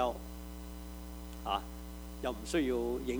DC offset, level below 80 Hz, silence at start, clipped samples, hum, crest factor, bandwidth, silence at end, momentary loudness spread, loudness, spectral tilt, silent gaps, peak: under 0.1%; -46 dBFS; 0 s; under 0.1%; none; 20 dB; over 20 kHz; 0 s; 13 LU; -38 LUFS; -5 dB/octave; none; -18 dBFS